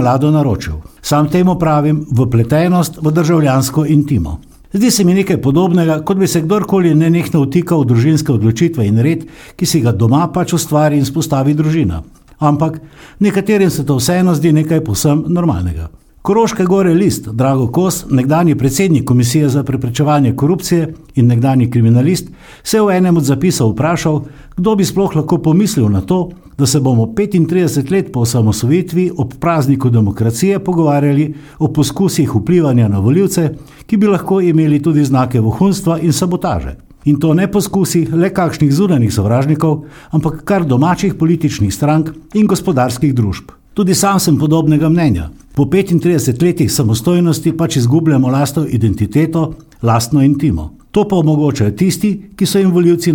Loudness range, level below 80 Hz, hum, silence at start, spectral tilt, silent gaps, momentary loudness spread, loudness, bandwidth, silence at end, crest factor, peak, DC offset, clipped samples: 2 LU; -36 dBFS; none; 0 s; -6.5 dB/octave; none; 6 LU; -13 LUFS; 18.5 kHz; 0 s; 12 dB; 0 dBFS; under 0.1%; under 0.1%